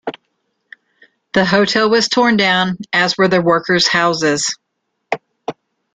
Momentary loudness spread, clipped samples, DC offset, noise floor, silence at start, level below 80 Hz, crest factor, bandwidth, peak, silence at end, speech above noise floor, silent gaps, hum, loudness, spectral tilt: 16 LU; under 0.1%; under 0.1%; -72 dBFS; 0.05 s; -56 dBFS; 16 dB; 9.4 kHz; 0 dBFS; 0.4 s; 58 dB; none; none; -14 LUFS; -3.5 dB/octave